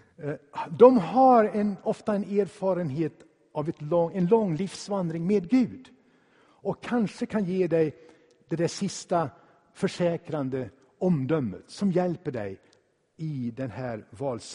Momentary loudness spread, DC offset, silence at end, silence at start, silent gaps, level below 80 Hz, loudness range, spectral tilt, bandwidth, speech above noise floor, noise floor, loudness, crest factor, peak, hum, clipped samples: 16 LU; under 0.1%; 0 s; 0.2 s; none; -66 dBFS; 7 LU; -7 dB/octave; 10.5 kHz; 40 dB; -65 dBFS; -27 LUFS; 24 dB; -4 dBFS; none; under 0.1%